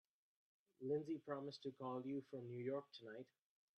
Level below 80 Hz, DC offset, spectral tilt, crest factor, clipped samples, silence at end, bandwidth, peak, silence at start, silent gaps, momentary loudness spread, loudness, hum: under -90 dBFS; under 0.1%; -7.5 dB/octave; 18 dB; under 0.1%; 0.55 s; 8.4 kHz; -32 dBFS; 0.8 s; none; 12 LU; -49 LUFS; none